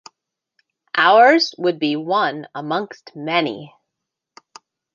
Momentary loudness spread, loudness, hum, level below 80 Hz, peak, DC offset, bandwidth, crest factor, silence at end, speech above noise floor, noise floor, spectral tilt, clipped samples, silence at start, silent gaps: 19 LU; -17 LUFS; none; -74 dBFS; -2 dBFS; under 0.1%; 7.4 kHz; 18 dB; 1.3 s; 64 dB; -81 dBFS; -4.5 dB/octave; under 0.1%; 0.95 s; none